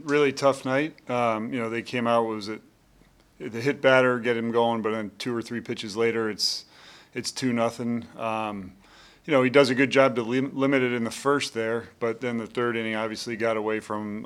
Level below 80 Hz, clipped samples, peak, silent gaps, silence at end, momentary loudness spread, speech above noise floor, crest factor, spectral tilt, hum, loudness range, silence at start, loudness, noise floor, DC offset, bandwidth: -68 dBFS; under 0.1%; -4 dBFS; none; 0 s; 12 LU; 33 dB; 22 dB; -5 dB/octave; none; 5 LU; 0 s; -25 LUFS; -58 dBFS; under 0.1%; 15 kHz